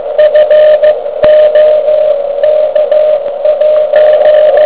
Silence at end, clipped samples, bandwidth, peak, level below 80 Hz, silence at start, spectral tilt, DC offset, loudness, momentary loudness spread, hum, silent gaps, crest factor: 0 s; 2%; 4 kHz; 0 dBFS; -46 dBFS; 0 s; -6.5 dB/octave; 1%; -7 LUFS; 5 LU; none; none; 6 dB